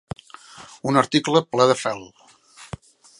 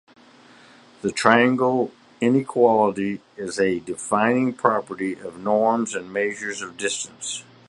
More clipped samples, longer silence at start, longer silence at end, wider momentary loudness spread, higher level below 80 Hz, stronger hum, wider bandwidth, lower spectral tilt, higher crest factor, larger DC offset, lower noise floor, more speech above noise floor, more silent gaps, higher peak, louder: neither; second, 0.55 s vs 1.05 s; first, 0.55 s vs 0.3 s; first, 22 LU vs 12 LU; first, -56 dBFS vs -64 dBFS; neither; about the same, 11.5 kHz vs 11.5 kHz; about the same, -5 dB/octave vs -4.5 dB/octave; about the same, 22 dB vs 22 dB; neither; second, -44 dBFS vs -50 dBFS; second, 24 dB vs 29 dB; neither; about the same, 0 dBFS vs 0 dBFS; about the same, -20 LUFS vs -22 LUFS